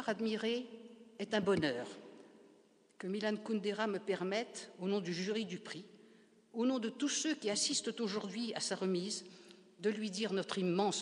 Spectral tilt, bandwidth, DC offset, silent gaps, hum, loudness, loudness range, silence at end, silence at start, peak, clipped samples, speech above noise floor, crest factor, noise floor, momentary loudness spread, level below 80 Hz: -4 dB/octave; 10.5 kHz; under 0.1%; none; none; -37 LUFS; 3 LU; 0 s; 0 s; -18 dBFS; under 0.1%; 30 dB; 20 dB; -67 dBFS; 14 LU; -82 dBFS